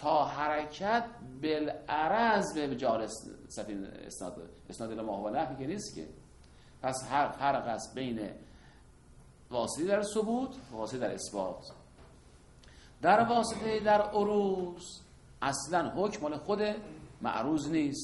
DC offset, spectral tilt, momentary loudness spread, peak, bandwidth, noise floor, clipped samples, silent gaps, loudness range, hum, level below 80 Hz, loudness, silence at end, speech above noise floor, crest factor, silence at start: under 0.1%; -4.5 dB/octave; 16 LU; -12 dBFS; 11.5 kHz; -57 dBFS; under 0.1%; none; 7 LU; none; -60 dBFS; -33 LUFS; 0 s; 25 dB; 22 dB; 0 s